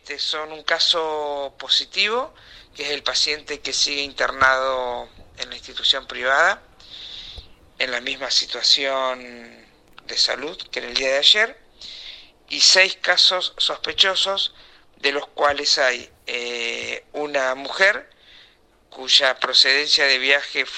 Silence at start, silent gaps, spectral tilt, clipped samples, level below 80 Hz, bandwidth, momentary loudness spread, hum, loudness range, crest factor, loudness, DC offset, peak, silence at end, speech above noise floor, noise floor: 0.05 s; none; 0.5 dB/octave; under 0.1%; -54 dBFS; 12.5 kHz; 17 LU; none; 5 LU; 22 dB; -19 LUFS; under 0.1%; 0 dBFS; 0 s; 34 dB; -55 dBFS